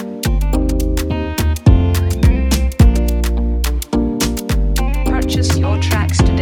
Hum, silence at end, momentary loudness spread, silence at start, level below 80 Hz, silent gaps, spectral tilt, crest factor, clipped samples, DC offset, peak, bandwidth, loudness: none; 0 s; 6 LU; 0 s; -16 dBFS; none; -6 dB/octave; 14 dB; under 0.1%; under 0.1%; 0 dBFS; 17.5 kHz; -16 LUFS